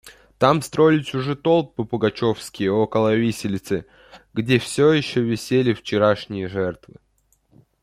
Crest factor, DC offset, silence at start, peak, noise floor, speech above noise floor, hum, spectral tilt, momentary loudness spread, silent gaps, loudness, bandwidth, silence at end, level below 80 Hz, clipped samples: 20 dB; under 0.1%; 0.05 s; -2 dBFS; -63 dBFS; 42 dB; none; -6 dB/octave; 10 LU; none; -21 LUFS; 15.5 kHz; 1.05 s; -56 dBFS; under 0.1%